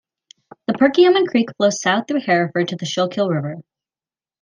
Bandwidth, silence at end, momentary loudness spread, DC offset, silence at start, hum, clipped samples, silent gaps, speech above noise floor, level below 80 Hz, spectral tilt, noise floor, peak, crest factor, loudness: 9.8 kHz; 0.8 s; 12 LU; under 0.1%; 0.7 s; none; under 0.1%; none; over 73 dB; -66 dBFS; -5 dB/octave; under -90 dBFS; -2 dBFS; 18 dB; -18 LUFS